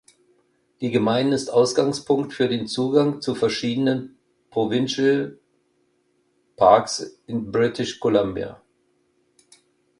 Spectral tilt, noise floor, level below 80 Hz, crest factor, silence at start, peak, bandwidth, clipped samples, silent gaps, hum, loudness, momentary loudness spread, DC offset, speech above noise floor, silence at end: -5 dB/octave; -67 dBFS; -58 dBFS; 22 dB; 0.8 s; -2 dBFS; 11.5 kHz; under 0.1%; none; none; -22 LUFS; 11 LU; under 0.1%; 46 dB; 1.45 s